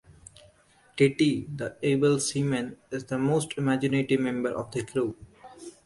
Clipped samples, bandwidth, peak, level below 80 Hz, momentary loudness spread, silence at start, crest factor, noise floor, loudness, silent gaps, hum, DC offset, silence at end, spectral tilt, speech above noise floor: under 0.1%; 11.5 kHz; -8 dBFS; -62 dBFS; 13 LU; 0.95 s; 18 dB; -60 dBFS; -27 LUFS; none; none; under 0.1%; 0.15 s; -5.5 dB/octave; 34 dB